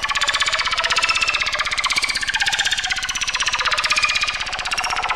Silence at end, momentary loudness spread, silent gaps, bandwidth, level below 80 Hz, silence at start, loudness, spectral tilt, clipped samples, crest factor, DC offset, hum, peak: 0 s; 4 LU; none; 16 kHz; -42 dBFS; 0 s; -18 LUFS; 1 dB/octave; under 0.1%; 16 dB; under 0.1%; none; -6 dBFS